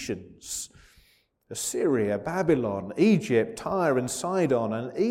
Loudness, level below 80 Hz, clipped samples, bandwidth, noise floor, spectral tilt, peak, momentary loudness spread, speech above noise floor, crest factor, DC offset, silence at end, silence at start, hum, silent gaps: -26 LUFS; -60 dBFS; under 0.1%; 16.5 kHz; -64 dBFS; -5.5 dB/octave; -10 dBFS; 12 LU; 39 dB; 16 dB; under 0.1%; 0 s; 0 s; none; none